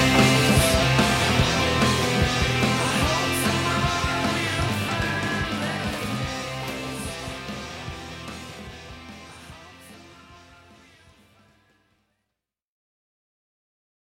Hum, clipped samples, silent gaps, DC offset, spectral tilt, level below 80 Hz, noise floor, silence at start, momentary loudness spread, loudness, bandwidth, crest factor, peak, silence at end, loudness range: none; under 0.1%; none; under 0.1%; -4 dB/octave; -38 dBFS; -84 dBFS; 0 s; 21 LU; -22 LUFS; 16.5 kHz; 22 dB; -4 dBFS; 3.65 s; 21 LU